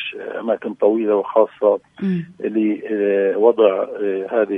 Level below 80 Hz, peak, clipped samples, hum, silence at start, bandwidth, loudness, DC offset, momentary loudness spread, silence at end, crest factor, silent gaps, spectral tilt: -70 dBFS; -2 dBFS; under 0.1%; none; 0 s; 3.8 kHz; -19 LUFS; under 0.1%; 8 LU; 0 s; 16 dB; none; -9 dB/octave